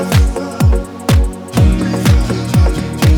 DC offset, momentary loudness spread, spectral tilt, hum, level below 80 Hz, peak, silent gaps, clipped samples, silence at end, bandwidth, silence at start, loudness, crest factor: under 0.1%; 4 LU; -6.5 dB/octave; none; -16 dBFS; 0 dBFS; none; under 0.1%; 0 s; 18.5 kHz; 0 s; -14 LUFS; 12 dB